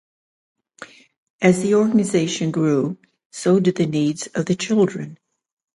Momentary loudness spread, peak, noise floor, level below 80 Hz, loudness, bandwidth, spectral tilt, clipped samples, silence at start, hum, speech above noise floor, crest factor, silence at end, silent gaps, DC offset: 11 LU; -2 dBFS; -43 dBFS; -62 dBFS; -19 LUFS; 11.5 kHz; -6 dB/octave; under 0.1%; 0.8 s; none; 25 dB; 18 dB; 0.6 s; 1.17-1.39 s, 3.26-3.30 s; under 0.1%